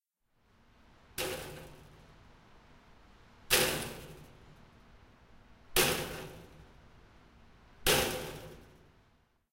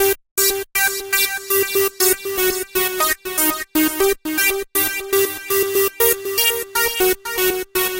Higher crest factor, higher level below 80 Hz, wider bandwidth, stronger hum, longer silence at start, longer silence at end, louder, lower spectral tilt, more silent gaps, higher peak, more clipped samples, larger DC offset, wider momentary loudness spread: first, 28 dB vs 16 dB; second, -54 dBFS vs -46 dBFS; about the same, 16 kHz vs 17 kHz; neither; first, 1.15 s vs 0 s; first, 0.9 s vs 0 s; second, -32 LUFS vs -17 LUFS; about the same, -2 dB/octave vs -1 dB/octave; second, none vs 0.31-0.36 s; second, -10 dBFS vs -4 dBFS; neither; neither; first, 25 LU vs 3 LU